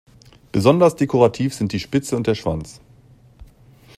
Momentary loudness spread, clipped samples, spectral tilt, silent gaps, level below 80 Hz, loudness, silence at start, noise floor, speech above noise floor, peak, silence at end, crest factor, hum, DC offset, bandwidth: 11 LU; under 0.1%; -6.5 dB/octave; none; -48 dBFS; -19 LUFS; 0.55 s; -49 dBFS; 31 dB; -2 dBFS; 0.55 s; 20 dB; none; under 0.1%; 15 kHz